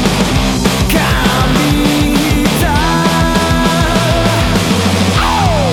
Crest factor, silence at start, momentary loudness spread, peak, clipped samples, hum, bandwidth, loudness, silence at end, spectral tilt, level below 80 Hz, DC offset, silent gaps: 10 dB; 0 s; 1 LU; 0 dBFS; under 0.1%; none; 19 kHz; -11 LUFS; 0 s; -5 dB/octave; -20 dBFS; under 0.1%; none